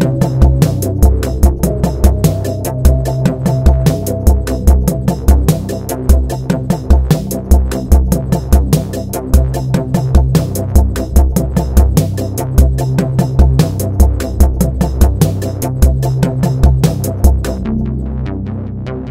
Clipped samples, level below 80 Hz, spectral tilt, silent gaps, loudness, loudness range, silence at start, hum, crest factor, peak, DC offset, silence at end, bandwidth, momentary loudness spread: 0.1%; -14 dBFS; -7 dB/octave; none; -13 LUFS; 1 LU; 0 s; none; 12 dB; 0 dBFS; under 0.1%; 0 s; 16 kHz; 6 LU